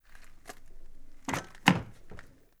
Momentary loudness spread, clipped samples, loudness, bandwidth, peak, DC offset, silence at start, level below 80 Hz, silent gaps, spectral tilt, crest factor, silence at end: 26 LU; under 0.1%; -30 LUFS; over 20 kHz; -2 dBFS; under 0.1%; 0.05 s; -50 dBFS; none; -4.5 dB/octave; 32 dB; 0.3 s